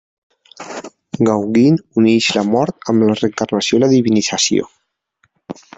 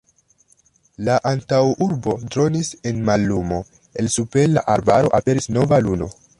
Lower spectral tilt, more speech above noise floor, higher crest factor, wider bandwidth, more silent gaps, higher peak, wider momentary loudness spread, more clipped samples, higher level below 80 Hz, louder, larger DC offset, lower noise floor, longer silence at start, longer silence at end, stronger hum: second, -4.5 dB/octave vs -6 dB/octave; first, 49 dB vs 40 dB; about the same, 14 dB vs 16 dB; second, 8.4 kHz vs 11.5 kHz; neither; about the same, -2 dBFS vs -2 dBFS; first, 19 LU vs 9 LU; neither; second, -56 dBFS vs -44 dBFS; first, -15 LUFS vs -19 LUFS; neither; first, -63 dBFS vs -58 dBFS; second, 0.6 s vs 1 s; about the same, 0.25 s vs 0.3 s; neither